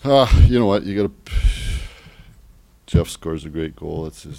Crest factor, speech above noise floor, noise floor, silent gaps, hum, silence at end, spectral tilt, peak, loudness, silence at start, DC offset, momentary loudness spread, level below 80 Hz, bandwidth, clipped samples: 18 dB; 31 dB; -49 dBFS; none; none; 0 s; -7 dB/octave; 0 dBFS; -20 LUFS; 0.05 s; under 0.1%; 15 LU; -24 dBFS; 15.5 kHz; under 0.1%